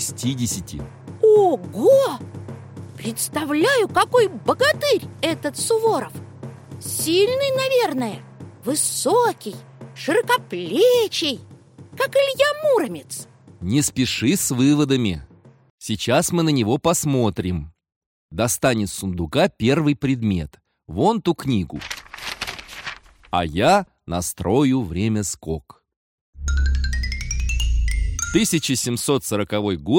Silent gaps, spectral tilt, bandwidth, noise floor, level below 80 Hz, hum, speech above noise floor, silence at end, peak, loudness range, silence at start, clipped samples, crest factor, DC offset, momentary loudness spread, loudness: 15.70-15.78 s, 17.96-18.29 s, 25.96-26.33 s; -4.5 dB/octave; 17 kHz; -43 dBFS; -32 dBFS; none; 23 dB; 0 s; -4 dBFS; 4 LU; 0 s; under 0.1%; 16 dB; under 0.1%; 16 LU; -20 LUFS